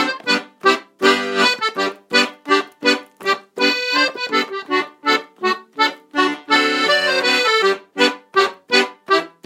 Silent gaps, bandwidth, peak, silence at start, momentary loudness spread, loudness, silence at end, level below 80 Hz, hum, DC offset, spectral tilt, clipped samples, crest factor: none; 16.5 kHz; 0 dBFS; 0 s; 6 LU; -17 LUFS; 0.15 s; -70 dBFS; none; under 0.1%; -2 dB/octave; under 0.1%; 18 dB